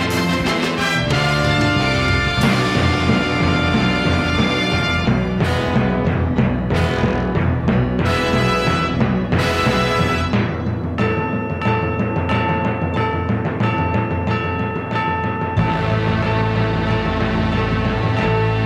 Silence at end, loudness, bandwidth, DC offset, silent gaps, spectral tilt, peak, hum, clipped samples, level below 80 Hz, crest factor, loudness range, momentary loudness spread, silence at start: 0 s; -18 LUFS; 15 kHz; under 0.1%; none; -6 dB/octave; -4 dBFS; none; under 0.1%; -32 dBFS; 14 dB; 3 LU; 4 LU; 0 s